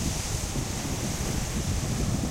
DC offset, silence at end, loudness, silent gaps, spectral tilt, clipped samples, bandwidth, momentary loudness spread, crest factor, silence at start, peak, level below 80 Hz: under 0.1%; 0 s; -30 LUFS; none; -4 dB/octave; under 0.1%; 16 kHz; 2 LU; 14 dB; 0 s; -14 dBFS; -36 dBFS